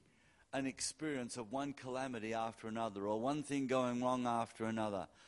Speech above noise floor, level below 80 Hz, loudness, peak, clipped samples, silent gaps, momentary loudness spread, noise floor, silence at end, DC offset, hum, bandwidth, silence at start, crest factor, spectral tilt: 30 dB; -74 dBFS; -40 LUFS; -22 dBFS; under 0.1%; none; 7 LU; -70 dBFS; 0 s; under 0.1%; none; 11.5 kHz; 0.5 s; 18 dB; -4.5 dB/octave